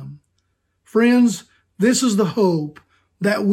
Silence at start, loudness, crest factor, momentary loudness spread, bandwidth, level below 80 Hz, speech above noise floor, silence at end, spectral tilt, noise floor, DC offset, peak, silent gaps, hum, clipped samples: 0 s; -18 LUFS; 14 dB; 14 LU; 15 kHz; -64 dBFS; 52 dB; 0 s; -5 dB/octave; -69 dBFS; under 0.1%; -4 dBFS; none; none; under 0.1%